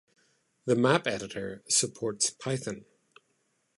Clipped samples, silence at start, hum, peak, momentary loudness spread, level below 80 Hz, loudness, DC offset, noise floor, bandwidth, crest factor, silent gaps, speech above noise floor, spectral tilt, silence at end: under 0.1%; 0.65 s; none; -8 dBFS; 14 LU; -68 dBFS; -29 LUFS; under 0.1%; -74 dBFS; 11.5 kHz; 22 dB; none; 45 dB; -3.5 dB/octave; 0.95 s